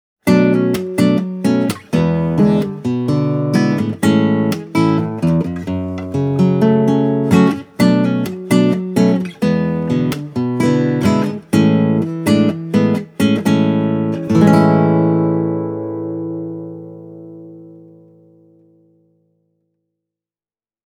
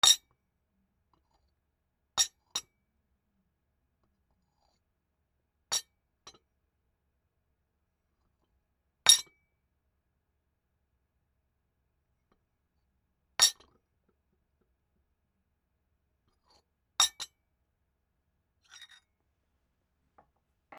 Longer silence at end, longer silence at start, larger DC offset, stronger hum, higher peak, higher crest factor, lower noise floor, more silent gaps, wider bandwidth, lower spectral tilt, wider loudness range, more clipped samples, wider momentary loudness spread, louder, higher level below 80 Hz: second, 3.1 s vs 3.55 s; first, 0.25 s vs 0.05 s; neither; neither; first, 0 dBFS vs -4 dBFS; second, 16 dB vs 34 dB; first, under -90 dBFS vs -80 dBFS; neither; about the same, 17 kHz vs 15.5 kHz; first, -7.5 dB/octave vs 3 dB/octave; second, 6 LU vs 12 LU; neither; second, 10 LU vs 19 LU; first, -15 LUFS vs -27 LUFS; first, -50 dBFS vs -74 dBFS